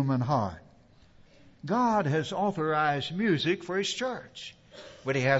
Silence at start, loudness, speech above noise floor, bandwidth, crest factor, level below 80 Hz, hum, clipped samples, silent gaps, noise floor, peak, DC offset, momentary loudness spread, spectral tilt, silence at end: 0 s; -29 LUFS; 29 dB; 8 kHz; 18 dB; -62 dBFS; none; under 0.1%; none; -57 dBFS; -12 dBFS; under 0.1%; 18 LU; -5.5 dB/octave; 0 s